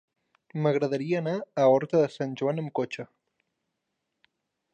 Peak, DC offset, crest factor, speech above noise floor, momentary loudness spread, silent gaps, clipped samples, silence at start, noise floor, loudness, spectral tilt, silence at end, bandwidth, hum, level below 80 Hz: -10 dBFS; under 0.1%; 18 dB; 56 dB; 13 LU; none; under 0.1%; 0.55 s; -82 dBFS; -27 LUFS; -7.5 dB/octave; 1.7 s; 8.8 kHz; none; -78 dBFS